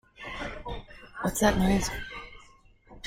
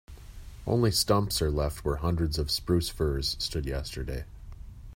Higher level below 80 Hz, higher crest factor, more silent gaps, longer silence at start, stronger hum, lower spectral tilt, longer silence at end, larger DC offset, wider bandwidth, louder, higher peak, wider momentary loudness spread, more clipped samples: about the same, -42 dBFS vs -38 dBFS; about the same, 22 dB vs 20 dB; neither; about the same, 0.2 s vs 0.1 s; neither; about the same, -4.5 dB/octave vs -5 dB/octave; about the same, 0 s vs 0 s; neither; about the same, 16.5 kHz vs 16.5 kHz; about the same, -29 LUFS vs -29 LUFS; about the same, -8 dBFS vs -10 dBFS; second, 18 LU vs 23 LU; neither